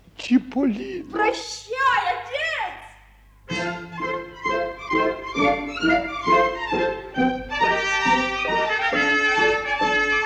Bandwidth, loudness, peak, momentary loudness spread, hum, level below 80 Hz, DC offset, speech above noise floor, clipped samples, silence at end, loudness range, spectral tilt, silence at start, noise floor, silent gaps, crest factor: 11 kHz; -22 LUFS; -6 dBFS; 9 LU; none; -48 dBFS; under 0.1%; 28 dB; under 0.1%; 0 s; 5 LU; -4 dB/octave; 0.2 s; -51 dBFS; none; 16 dB